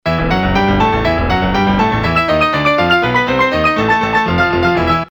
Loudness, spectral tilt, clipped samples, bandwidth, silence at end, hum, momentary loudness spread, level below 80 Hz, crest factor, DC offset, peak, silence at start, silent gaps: -13 LUFS; -6.5 dB/octave; under 0.1%; over 20 kHz; 0.05 s; none; 2 LU; -28 dBFS; 12 dB; under 0.1%; 0 dBFS; 0.05 s; none